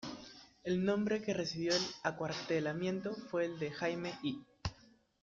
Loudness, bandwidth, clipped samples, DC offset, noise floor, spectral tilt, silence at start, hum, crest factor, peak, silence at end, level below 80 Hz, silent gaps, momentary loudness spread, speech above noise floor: -37 LUFS; 7.8 kHz; under 0.1%; under 0.1%; -65 dBFS; -5 dB/octave; 0 s; none; 20 dB; -18 dBFS; 0.5 s; -64 dBFS; none; 11 LU; 29 dB